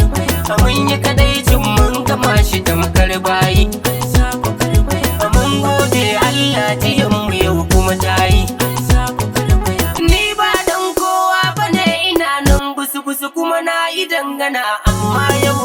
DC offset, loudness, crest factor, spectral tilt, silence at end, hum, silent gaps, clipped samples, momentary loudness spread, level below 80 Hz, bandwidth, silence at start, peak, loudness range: under 0.1%; -14 LUFS; 14 dB; -4.5 dB/octave; 0 s; none; none; under 0.1%; 4 LU; -20 dBFS; over 20 kHz; 0 s; 0 dBFS; 2 LU